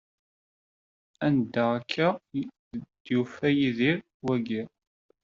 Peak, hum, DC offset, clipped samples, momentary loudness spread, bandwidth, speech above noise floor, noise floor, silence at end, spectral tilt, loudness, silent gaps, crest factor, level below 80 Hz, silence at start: -10 dBFS; none; under 0.1%; under 0.1%; 14 LU; 7.4 kHz; over 64 dB; under -90 dBFS; 0.55 s; -5 dB/octave; -28 LUFS; 2.59-2.71 s, 3.00-3.05 s, 4.14-4.20 s; 20 dB; -68 dBFS; 1.2 s